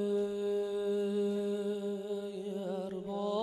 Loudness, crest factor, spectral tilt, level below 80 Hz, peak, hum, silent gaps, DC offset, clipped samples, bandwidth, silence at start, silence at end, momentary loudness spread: -35 LUFS; 12 dB; -7 dB/octave; -74 dBFS; -22 dBFS; none; none; under 0.1%; under 0.1%; 12.5 kHz; 0 s; 0 s; 6 LU